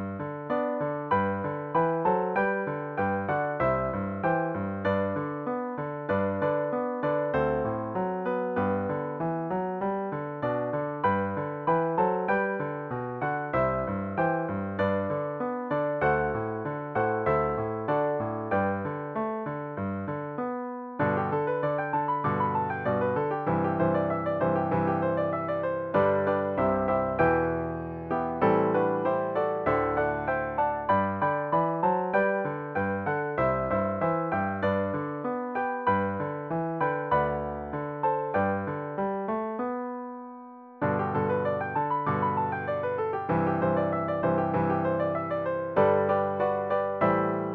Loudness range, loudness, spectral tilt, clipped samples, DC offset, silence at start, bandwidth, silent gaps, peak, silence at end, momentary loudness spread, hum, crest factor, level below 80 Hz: 3 LU; -28 LUFS; -10 dB/octave; under 0.1%; under 0.1%; 0 s; 4.9 kHz; none; -10 dBFS; 0 s; 7 LU; none; 18 dB; -54 dBFS